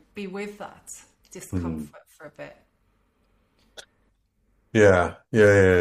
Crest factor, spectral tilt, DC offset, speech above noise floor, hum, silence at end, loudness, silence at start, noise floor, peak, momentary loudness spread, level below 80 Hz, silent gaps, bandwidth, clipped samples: 22 dB; -6 dB/octave; under 0.1%; 45 dB; none; 0 s; -21 LUFS; 0.15 s; -68 dBFS; -4 dBFS; 25 LU; -52 dBFS; none; 14 kHz; under 0.1%